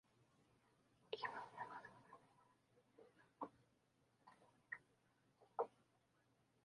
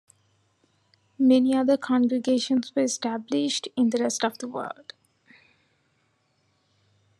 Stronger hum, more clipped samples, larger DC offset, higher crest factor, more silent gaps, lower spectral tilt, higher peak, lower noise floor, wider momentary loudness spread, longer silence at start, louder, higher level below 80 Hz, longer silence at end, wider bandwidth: neither; neither; neither; first, 28 dB vs 18 dB; neither; about the same, -4.5 dB/octave vs -3.5 dB/octave; second, -30 dBFS vs -10 dBFS; first, -81 dBFS vs -70 dBFS; about the same, 15 LU vs 13 LU; second, 0.2 s vs 1.2 s; second, -53 LUFS vs -24 LUFS; second, under -90 dBFS vs -82 dBFS; second, 0.95 s vs 2.45 s; second, 11 kHz vs 12.5 kHz